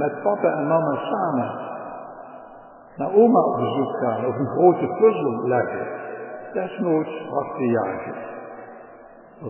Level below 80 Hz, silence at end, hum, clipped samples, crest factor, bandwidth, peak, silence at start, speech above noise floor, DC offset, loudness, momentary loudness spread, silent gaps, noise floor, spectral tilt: -66 dBFS; 0 s; none; under 0.1%; 20 dB; 3.2 kHz; -4 dBFS; 0 s; 24 dB; under 0.1%; -22 LUFS; 20 LU; none; -45 dBFS; -11.5 dB/octave